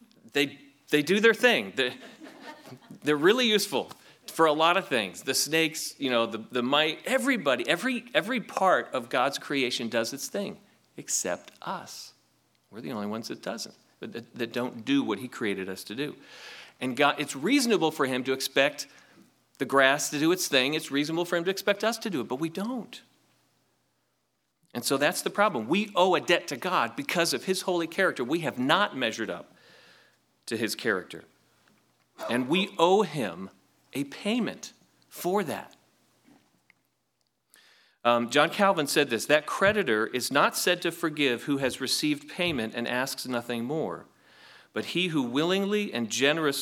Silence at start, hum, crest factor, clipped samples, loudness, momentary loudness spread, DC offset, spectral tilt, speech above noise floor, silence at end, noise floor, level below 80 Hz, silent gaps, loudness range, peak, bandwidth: 0.25 s; none; 24 dB; under 0.1%; -27 LUFS; 16 LU; under 0.1%; -3.5 dB/octave; 49 dB; 0 s; -77 dBFS; -74 dBFS; none; 9 LU; -4 dBFS; 19 kHz